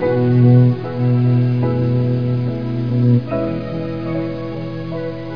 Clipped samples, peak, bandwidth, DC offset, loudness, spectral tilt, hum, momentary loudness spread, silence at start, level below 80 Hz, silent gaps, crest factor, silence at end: under 0.1%; -2 dBFS; 5.2 kHz; 1%; -17 LUFS; -11 dB/octave; none; 13 LU; 0 s; -46 dBFS; none; 14 dB; 0 s